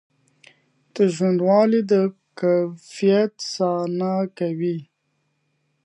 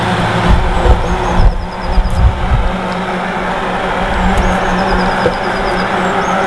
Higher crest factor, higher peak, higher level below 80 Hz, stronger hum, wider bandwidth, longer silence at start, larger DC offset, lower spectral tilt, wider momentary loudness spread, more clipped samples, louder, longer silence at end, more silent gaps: first, 18 dB vs 12 dB; second, -4 dBFS vs 0 dBFS; second, -76 dBFS vs -16 dBFS; neither; about the same, 10.5 kHz vs 11 kHz; first, 0.95 s vs 0 s; second, under 0.1% vs 1%; about the same, -6.5 dB/octave vs -6 dB/octave; first, 9 LU vs 4 LU; second, under 0.1% vs 0.1%; second, -21 LUFS vs -14 LUFS; first, 1 s vs 0 s; neither